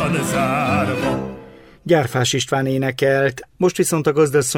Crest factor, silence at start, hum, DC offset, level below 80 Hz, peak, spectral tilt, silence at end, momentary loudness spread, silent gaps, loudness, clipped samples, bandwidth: 16 dB; 0 s; none; under 0.1%; -48 dBFS; -4 dBFS; -4.5 dB/octave; 0 s; 6 LU; none; -18 LUFS; under 0.1%; 16.5 kHz